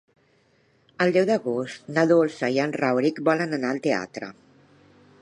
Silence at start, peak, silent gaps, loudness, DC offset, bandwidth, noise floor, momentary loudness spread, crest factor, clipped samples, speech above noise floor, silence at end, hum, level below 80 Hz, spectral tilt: 1 s; -6 dBFS; none; -23 LUFS; under 0.1%; 10.5 kHz; -63 dBFS; 9 LU; 18 dB; under 0.1%; 40 dB; 0.9 s; none; -72 dBFS; -6 dB/octave